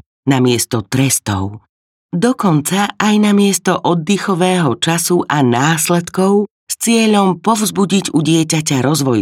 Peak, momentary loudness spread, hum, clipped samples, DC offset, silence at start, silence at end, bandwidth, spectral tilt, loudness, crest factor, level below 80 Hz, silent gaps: 0 dBFS; 5 LU; none; under 0.1%; under 0.1%; 0.25 s; 0 s; 16.5 kHz; -4.5 dB/octave; -14 LUFS; 14 dB; -56 dBFS; 1.69-2.09 s, 6.51-6.67 s